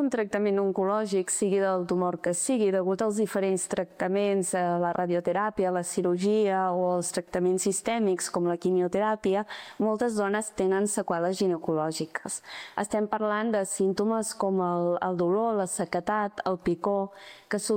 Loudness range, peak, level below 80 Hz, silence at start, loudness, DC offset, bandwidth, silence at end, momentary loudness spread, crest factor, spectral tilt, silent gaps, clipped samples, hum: 2 LU; -12 dBFS; -64 dBFS; 0 s; -27 LUFS; under 0.1%; 17 kHz; 0 s; 5 LU; 14 dB; -5 dB/octave; none; under 0.1%; none